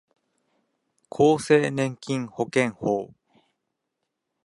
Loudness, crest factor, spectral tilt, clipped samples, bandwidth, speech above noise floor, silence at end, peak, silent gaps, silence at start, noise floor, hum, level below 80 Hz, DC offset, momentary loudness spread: -24 LUFS; 20 dB; -6 dB/octave; under 0.1%; 11.5 kHz; 58 dB; 1.4 s; -6 dBFS; none; 1.15 s; -81 dBFS; none; -66 dBFS; under 0.1%; 10 LU